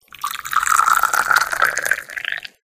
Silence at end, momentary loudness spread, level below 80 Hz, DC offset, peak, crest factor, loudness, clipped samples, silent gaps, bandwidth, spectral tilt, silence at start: 0.2 s; 11 LU; -56 dBFS; under 0.1%; -2 dBFS; 18 dB; -17 LUFS; under 0.1%; none; 16 kHz; 1 dB/octave; 0.2 s